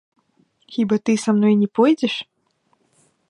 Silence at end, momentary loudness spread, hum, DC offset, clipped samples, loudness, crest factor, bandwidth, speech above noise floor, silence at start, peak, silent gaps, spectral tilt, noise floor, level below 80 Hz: 1.1 s; 13 LU; none; under 0.1%; under 0.1%; -19 LUFS; 16 dB; 11 kHz; 48 dB; 0.7 s; -4 dBFS; none; -6 dB/octave; -66 dBFS; -72 dBFS